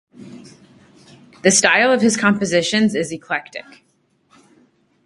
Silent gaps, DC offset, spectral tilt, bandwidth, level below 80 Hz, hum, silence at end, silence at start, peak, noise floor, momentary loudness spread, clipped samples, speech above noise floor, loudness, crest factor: none; under 0.1%; -3 dB/octave; 11.5 kHz; -60 dBFS; none; 1.45 s; 0.2 s; 0 dBFS; -60 dBFS; 12 LU; under 0.1%; 43 dB; -16 LUFS; 20 dB